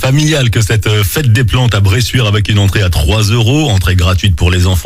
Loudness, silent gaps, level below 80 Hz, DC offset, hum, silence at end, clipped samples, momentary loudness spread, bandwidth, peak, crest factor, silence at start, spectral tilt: -10 LUFS; none; -22 dBFS; under 0.1%; none; 0 s; under 0.1%; 1 LU; 16 kHz; 0 dBFS; 8 dB; 0 s; -5 dB/octave